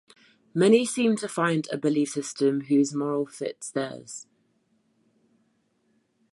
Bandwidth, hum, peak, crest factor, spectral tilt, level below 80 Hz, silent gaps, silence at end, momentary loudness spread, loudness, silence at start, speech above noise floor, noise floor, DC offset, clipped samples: 11.5 kHz; none; -6 dBFS; 20 dB; -5 dB/octave; -78 dBFS; none; 2.1 s; 13 LU; -25 LUFS; 0.55 s; 45 dB; -70 dBFS; under 0.1%; under 0.1%